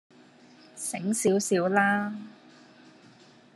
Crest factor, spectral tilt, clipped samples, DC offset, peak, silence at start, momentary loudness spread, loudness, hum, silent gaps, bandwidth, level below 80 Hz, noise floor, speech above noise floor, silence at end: 22 dB; -4.5 dB/octave; under 0.1%; under 0.1%; -8 dBFS; 0.75 s; 20 LU; -26 LUFS; none; none; 13 kHz; -78 dBFS; -55 dBFS; 29 dB; 1.25 s